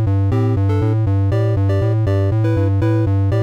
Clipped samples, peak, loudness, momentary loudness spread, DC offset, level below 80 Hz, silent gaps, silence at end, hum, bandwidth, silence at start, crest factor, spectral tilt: under 0.1%; -10 dBFS; -17 LUFS; 0 LU; 0.2%; -36 dBFS; none; 0 s; none; 5.6 kHz; 0 s; 6 dB; -9.5 dB/octave